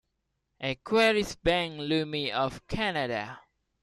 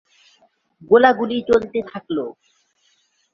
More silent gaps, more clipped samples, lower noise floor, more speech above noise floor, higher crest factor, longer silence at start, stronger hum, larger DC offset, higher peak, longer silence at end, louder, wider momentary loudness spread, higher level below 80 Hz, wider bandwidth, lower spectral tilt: neither; neither; first, -80 dBFS vs -63 dBFS; first, 51 dB vs 46 dB; about the same, 20 dB vs 20 dB; second, 0.6 s vs 0.9 s; neither; neither; second, -10 dBFS vs -2 dBFS; second, 0.45 s vs 1.05 s; second, -28 LUFS vs -18 LUFS; about the same, 11 LU vs 13 LU; about the same, -52 dBFS vs -56 dBFS; first, 14.5 kHz vs 7.2 kHz; second, -4.5 dB/octave vs -6 dB/octave